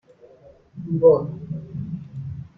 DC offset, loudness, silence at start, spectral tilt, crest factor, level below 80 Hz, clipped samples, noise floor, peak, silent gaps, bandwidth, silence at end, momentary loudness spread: under 0.1%; -22 LUFS; 0.75 s; -12.5 dB/octave; 20 dB; -56 dBFS; under 0.1%; -50 dBFS; -4 dBFS; none; 4.7 kHz; 0.1 s; 18 LU